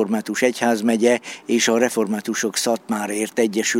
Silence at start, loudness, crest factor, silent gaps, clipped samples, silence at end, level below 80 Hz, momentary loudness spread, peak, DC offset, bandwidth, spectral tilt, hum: 0 s; -20 LUFS; 16 dB; none; under 0.1%; 0 s; -70 dBFS; 6 LU; -4 dBFS; under 0.1%; 16.5 kHz; -3 dB/octave; none